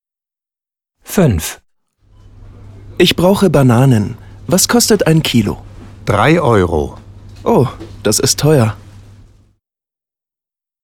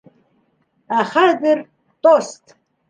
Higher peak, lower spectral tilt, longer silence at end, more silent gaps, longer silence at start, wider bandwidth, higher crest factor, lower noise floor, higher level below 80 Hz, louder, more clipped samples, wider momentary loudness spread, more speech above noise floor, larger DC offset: about the same, 0 dBFS vs -2 dBFS; about the same, -5 dB/octave vs -4 dB/octave; first, 2.05 s vs 0.55 s; neither; first, 1.1 s vs 0.9 s; first, 18 kHz vs 9.6 kHz; about the same, 14 dB vs 18 dB; first, -89 dBFS vs -63 dBFS; first, -36 dBFS vs -74 dBFS; first, -12 LUFS vs -16 LUFS; neither; first, 14 LU vs 8 LU; first, 78 dB vs 48 dB; neither